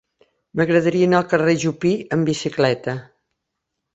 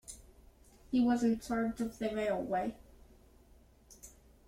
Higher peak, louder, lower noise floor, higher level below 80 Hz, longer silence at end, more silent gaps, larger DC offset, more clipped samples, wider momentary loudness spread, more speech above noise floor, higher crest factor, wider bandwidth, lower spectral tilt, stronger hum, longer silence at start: first, -2 dBFS vs -20 dBFS; first, -19 LUFS vs -34 LUFS; first, -79 dBFS vs -62 dBFS; about the same, -58 dBFS vs -60 dBFS; first, 0.9 s vs 0.4 s; neither; neither; neither; second, 10 LU vs 24 LU; first, 60 dB vs 29 dB; about the same, 18 dB vs 16 dB; second, 8.2 kHz vs 15.5 kHz; about the same, -6 dB/octave vs -5.5 dB/octave; neither; first, 0.55 s vs 0.1 s